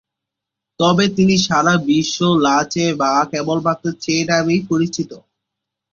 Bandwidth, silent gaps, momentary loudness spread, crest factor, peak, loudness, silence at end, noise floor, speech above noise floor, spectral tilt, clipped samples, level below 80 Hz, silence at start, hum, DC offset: 7.4 kHz; none; 6 LU; 16 dB; 0 dBFS; -16 LUFS; 0.75 s; -83 dBFS; 67 dB; -5 dB/octave; under 0.1%; -54 dBFS; 0.8 s; none; under 0.1%